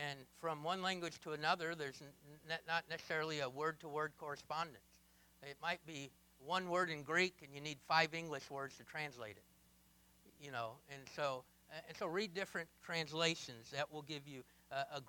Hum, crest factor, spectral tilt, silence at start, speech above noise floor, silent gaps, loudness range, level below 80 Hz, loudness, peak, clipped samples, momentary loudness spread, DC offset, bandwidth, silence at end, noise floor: none; 26 dB; -3.5 dB/octave; 0 s; 27 dB; none; 7 LU; -80 dBFS; -42 LUFS; -18 dBFS; under 0.1%; 17 LU; under 0.1%; 19 kHz; 0 s; -70 dBFS